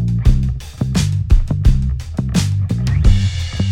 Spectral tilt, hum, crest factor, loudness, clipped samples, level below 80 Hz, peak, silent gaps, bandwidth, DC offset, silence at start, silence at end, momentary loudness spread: -6 dB/octave; none; 14 dB; -17 LUFS; under 0.1%; -18 dBFS; 0 dBFS; none; 13 kHz; under 0.1%; 0 s; 0 s; 6 LU